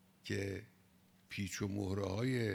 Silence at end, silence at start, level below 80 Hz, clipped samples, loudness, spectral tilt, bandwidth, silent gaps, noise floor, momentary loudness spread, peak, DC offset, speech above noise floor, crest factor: 0 s; 0.25 s; -70 dBFS; under 0.1%; -40 LUFS; -5.5 dB/octave; 18 kHz; none; -68 dBFS; 8 LU; -24 dBFS; under 0.1%; 30 dB; 18 dB